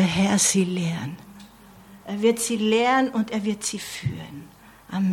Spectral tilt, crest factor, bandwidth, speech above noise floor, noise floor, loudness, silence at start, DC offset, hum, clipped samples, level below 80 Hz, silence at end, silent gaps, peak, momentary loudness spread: -4 dB/octave; 16 dB; 16.5 kHz; 25 dB; -48 dBFS; -23 LUFS; 0 s; under 0.1%; none; under 0.1%; -56 dBFS; 0 s; none; -8 dBFS; 18 LU